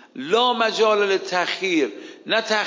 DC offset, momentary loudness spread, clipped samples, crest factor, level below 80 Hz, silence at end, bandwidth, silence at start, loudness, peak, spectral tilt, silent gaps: under 0.1%; 5 LU; under 0.1%; 14 dB; -78 dBFS; 0 s; 7.6 kHz; 0.15 s; -20 LUFS; -6 dBFS; -3 dB/octave; none